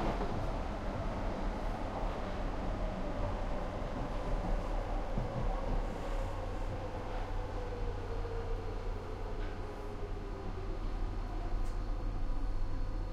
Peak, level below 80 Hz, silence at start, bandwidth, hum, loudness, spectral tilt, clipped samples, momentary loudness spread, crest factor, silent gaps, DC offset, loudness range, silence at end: -22 dBFS; -38 dBFS; 0 s; 8.2 kHz; none; -40 LUFS; -7 dB/octave; under 0.1%; 5 LU; 14 dB; none; under 0.1%; 3 LU; 0 s